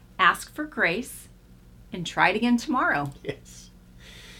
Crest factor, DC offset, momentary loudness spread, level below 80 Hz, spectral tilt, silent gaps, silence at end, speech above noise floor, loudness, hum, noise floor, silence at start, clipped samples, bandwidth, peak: 22 dB; under 0.1%; 20 LU; -52 dBFS; -4 dB/octave; none; 0 s; 25 dB; -24 LUFS; 60 Hz at -45 dBFS; -51 dBFS; 0.2 s; under 0.1%; 17 kHz; -4 dBFS